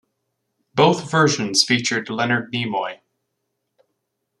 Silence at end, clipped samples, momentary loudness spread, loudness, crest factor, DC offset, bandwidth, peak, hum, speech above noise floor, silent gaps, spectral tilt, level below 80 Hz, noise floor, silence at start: 1.45 s; under 0.1%; 9 LU; -19 LUFS; 20 dB; under 0.1%; 12.5 kHz; -2 dBFS; none; 57 dB; none; -3.5 dB/octave; -64 dBFS; -76 dBFS; 0.75 s